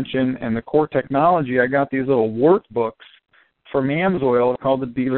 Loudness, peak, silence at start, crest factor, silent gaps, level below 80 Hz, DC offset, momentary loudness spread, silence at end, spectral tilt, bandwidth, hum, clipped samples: -19 LUFS; -2 dBFS; 0 s; 16 dB; none; -54 dBFS; under 0.1%; 7 LU; 0 s; -6 dB/octave; 4.3 kHz; none; under 0.1%